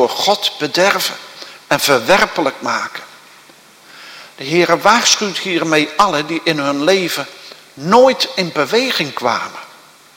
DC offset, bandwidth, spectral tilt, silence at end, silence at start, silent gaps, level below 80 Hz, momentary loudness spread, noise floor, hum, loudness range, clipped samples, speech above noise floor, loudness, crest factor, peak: under 0.1%; 17 kHz; -3 dB/octave; 0.5 s; 0 s; none; -54 dBFS; 20 LU; -44 dBFS; none; 3 LU; 0.1%; 29 dB; -14 LUFS; 16 dB; 0 dBFS